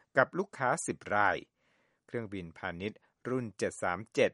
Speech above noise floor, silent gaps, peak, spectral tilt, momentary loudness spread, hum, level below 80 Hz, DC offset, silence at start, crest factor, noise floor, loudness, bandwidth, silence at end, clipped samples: 41 dB; none; -10 dBFS; -4.5 dB/octave; 12 LU; none; -70 dBFS; under 0.1%; 0.15 s; 24 dB; -74 dBFS; -34 LUFS; 11.5 kHz; 0 s; under 0.1%